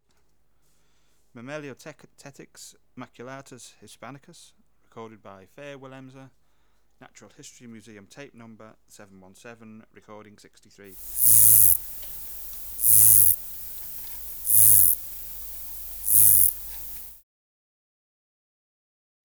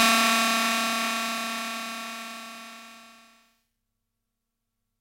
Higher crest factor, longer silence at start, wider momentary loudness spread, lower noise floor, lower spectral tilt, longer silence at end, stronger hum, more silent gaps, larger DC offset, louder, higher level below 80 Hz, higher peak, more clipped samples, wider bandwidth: about the same, 20 dB vs 22 dB; first, 1.45 s vs 0 s; first, 27 LU vs 22 LU; second, -69 dBFS vs -82 dBFS; about the same, -1.5 dB/octave vs -0.5 dB/octave; first, 2.2 s vs 1.9 s; second, none vs 50 Hz at -80 dBFS; neither; first, 0.1% vs under 0.1%; first, -15 LUFS vs -25 LUFS; first, -54 dBFS vs -78 dBFS; about the same, -6 dBFS vs -6 dBFS; neither; first, over 20 kHz vs 16.5 kHz